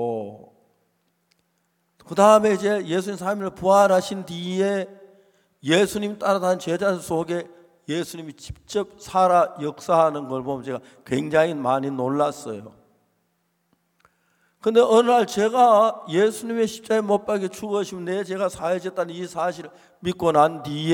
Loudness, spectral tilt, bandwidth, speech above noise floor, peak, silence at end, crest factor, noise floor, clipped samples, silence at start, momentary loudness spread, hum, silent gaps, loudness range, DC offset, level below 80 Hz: -22 LUFS; -5 dB/octave; 17 kHz; 49 dB; -2 dBFS; 0 s; 20 dB; -71 dBFS; under 0.1%; 0 s; 14 LU; none; none; 6 LU; under 0.1%; -60 dBFS